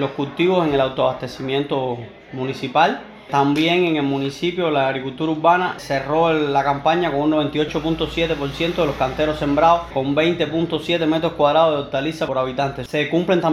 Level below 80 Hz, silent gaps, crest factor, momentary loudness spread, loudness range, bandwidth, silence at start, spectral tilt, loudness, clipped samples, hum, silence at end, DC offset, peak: -44 dBFS; none; 16 dB; 7 LU; 2 LU; 13.5 kHz; 0 s; -6 dB/octave; -19 LUFS; under 0.1%; none; 0 s; under 0.1%; -2 dBFS